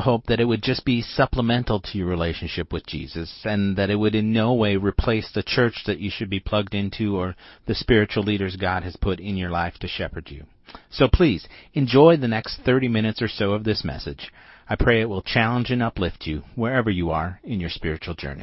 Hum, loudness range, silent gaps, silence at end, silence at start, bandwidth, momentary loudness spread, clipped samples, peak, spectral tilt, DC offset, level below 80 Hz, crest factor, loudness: none; 4 LU; none; 0 s; 0 s; 6 kHz; 11 LU; under 0.1%; -2 dBFS; -9.5 dB/octave; under 0.1%; -36 dBFS; 20 dB; -23 LUFS